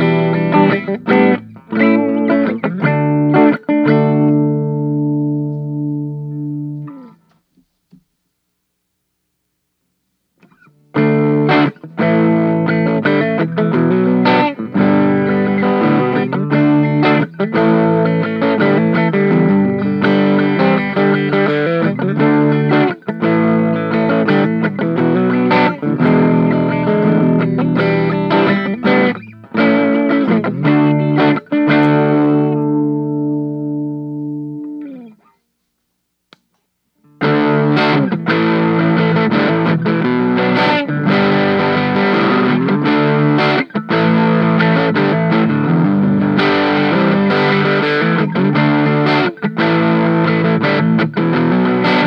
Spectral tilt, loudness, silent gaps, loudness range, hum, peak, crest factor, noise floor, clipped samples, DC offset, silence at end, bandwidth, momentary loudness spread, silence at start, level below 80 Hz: -9 dB/octave; -14 LUFS; none; 7 LU; none; 0 dBFS; 14 dB; -70 dBFS; under 0.1%; under 0.1%; 0 s; 6 kHz; 6 LU; 0 s; -60 dBFS